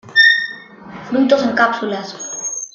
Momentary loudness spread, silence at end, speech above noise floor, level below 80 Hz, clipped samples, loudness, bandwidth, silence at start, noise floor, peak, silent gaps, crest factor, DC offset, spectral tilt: 22 LU; 0.05 s; 19 dB; -64 dBFS; under 0.1%; -15 LUFS; 10 kHz; 0.05 s; -35 dBFS; -2 dBFS; none; 16 dB; under 0.1%; -2 dB/octave